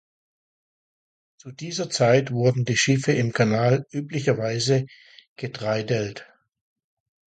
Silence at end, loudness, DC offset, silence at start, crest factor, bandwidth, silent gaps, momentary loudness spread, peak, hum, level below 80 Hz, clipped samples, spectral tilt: 1.05 s; -23 LUFS; under 0.1%; 1.45 s; 20 dB; 9.2 kHz; 5.27-5.36 s; 15 LU; -6 dBFS; none; -62 dBFS; under 0.1%; -5 dB/octave